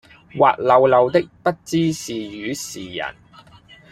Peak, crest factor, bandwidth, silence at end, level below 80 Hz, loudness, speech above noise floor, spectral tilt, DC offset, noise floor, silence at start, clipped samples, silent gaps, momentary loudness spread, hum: -2 dBFS; 18 dB; 15.5 kHz; 0.8 s; -56 dBFS; -19 LUFS; 28 dB; -5 dB/octave; under 0.1%; -47 dBFS; 0.35 s; under 0.1%; none; 15 LU; none